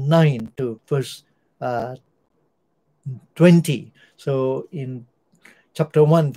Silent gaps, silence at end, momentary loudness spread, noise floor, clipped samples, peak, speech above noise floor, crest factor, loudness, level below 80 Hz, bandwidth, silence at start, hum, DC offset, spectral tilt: none; 0 s; 22 LU; -69 dBFS; under 0.1%; -2 dBFS; 50 dB; 20 dB; -20 LUFS; -64 dBFS; 15 kHz; 0 s; none; under 0.1%; -7.5 dB/octave